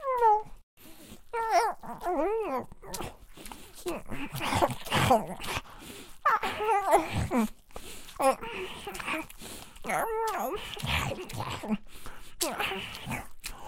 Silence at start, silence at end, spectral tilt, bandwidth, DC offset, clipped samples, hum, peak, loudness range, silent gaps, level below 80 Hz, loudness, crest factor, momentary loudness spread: 0 s; 0 s; -4 dB/octave; 17 kHz; under 0.1%; under 0.1%; none; -10 dBFS; 5 LU; 0.63-0.77 s; -48 dBFS; -30 LUFS; 20 dB; 20 LU